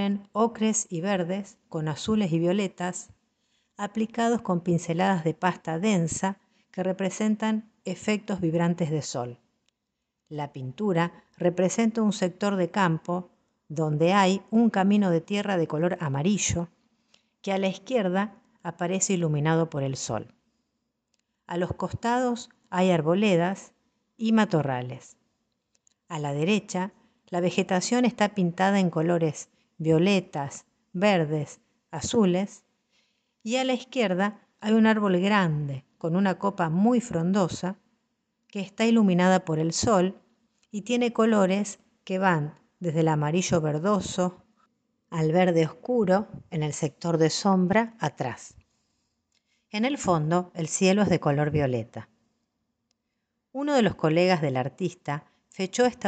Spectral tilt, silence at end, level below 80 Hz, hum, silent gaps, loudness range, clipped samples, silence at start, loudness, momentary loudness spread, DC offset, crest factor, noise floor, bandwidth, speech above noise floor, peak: -5.5 dB/octave; 0 s; -60 dBFS; none; none; 4 LU; under 0.1%; 0 s; -26 LUFS; 13 LU; under 0.1%; 18 dB; -82 dBFS; 9.2 kHz; 57 dB; -8 dBFS